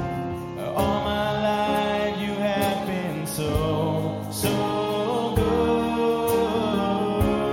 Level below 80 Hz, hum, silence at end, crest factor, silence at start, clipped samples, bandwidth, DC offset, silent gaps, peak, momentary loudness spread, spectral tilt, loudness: -42 dBFS; none; 0 s; 16 dB; 0 s; under 0.1%; 17 kHz; under 0.1%; none; -8 dBFS; 6 LU; -5.5 dB/octave; -24 LUFS